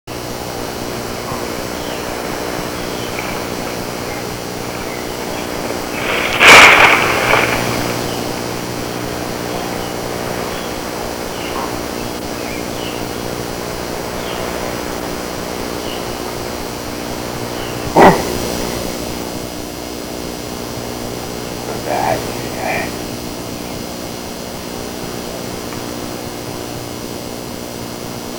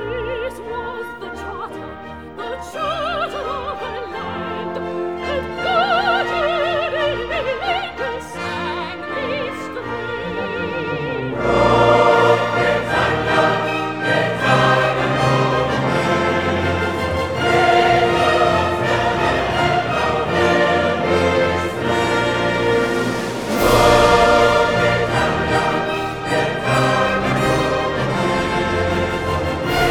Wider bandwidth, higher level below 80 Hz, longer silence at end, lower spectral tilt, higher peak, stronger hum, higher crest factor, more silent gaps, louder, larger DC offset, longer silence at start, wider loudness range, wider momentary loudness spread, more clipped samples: about the same, over 20 kHz vs over 20 kHz; about the same, -38 dBFS vs -38 dBFS; about the same, 0 s vs 0 s; second, -3 dB/octave vs -5 dB/octave; about the same, 0 dBFS vs 0 dBFS; neither; about the same, 18 dB vs 18 dB; neither; about the same, -17 LUFS vs -18 LUFS; second, under 0.1% vs 0.4%; about the same, 0.05 s vs 0 s; first, 15 LU vs 9 LU; about the same, 13 LU vs 12 LU; first, 0.4% vs under 0.1%